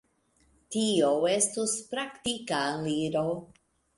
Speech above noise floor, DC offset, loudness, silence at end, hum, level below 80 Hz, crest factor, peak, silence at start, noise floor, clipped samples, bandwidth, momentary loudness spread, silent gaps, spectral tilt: 39 dB; under 0.1%; -28 LUFS; 0.5 s; none; -66 dBFS; 18 dB; -12 dBFS; 0.7 s; -68 dBFS; under 0.1%; 11.5 kHz; 9 LU; none; -3.5 dB/octave